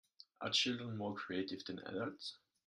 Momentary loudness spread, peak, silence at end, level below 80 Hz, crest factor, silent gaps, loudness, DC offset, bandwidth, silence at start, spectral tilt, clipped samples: 12 LU; -20 dBFS; 0.3 s; -82 dBFS; 22 dB; none; -40 LUFS; under 0.1%; 13 kHz; 0.4 s; -3.5 dB/octave; under 0.1%